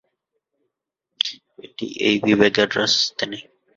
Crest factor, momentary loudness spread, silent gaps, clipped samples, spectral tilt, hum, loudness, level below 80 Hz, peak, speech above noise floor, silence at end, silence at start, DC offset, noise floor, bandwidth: 22 dB; 16 LU; none; under 0.1%; -3.5 dB/octave; none; -19 LUFS; -62 dBFS; 0 dBFS; 62 dB; 0.35 s; 1.25 s; under 0.1%; -81 dBFS; 7.6 kHz